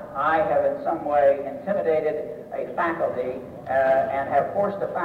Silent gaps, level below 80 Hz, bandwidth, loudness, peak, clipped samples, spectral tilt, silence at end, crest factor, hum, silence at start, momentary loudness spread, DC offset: none; -60 dBFS; 5.6 kHz; -24 LUFS; -10 dBFS; under 0.1%; -7.5 dB/octave; 0 s; 12 dB; none; 0 s; 11 LU; under 0.1%